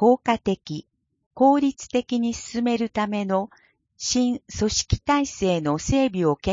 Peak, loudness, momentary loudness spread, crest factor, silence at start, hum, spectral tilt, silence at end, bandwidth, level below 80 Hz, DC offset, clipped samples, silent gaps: -6 dBFS; -23 LUFS; 8 LU; 16 dB; 0 s; none; -5 dB/octave; 0 s; 7.8 kHz; -42 dBFS; under 0.1%; under 0.1%; 1.26-1.31 s